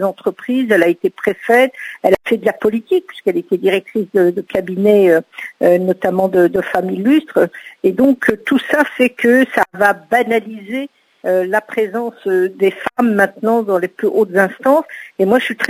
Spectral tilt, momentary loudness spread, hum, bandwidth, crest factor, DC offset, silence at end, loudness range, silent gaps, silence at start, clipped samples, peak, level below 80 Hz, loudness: -6 dB/octave; 7 LU; none; 16 kHz; 14 dB; under 0.1%; 0 s; 3 LU; none; 0 s; under 0.1%; 0 dBFS; -58 dBFS; -15 LUFS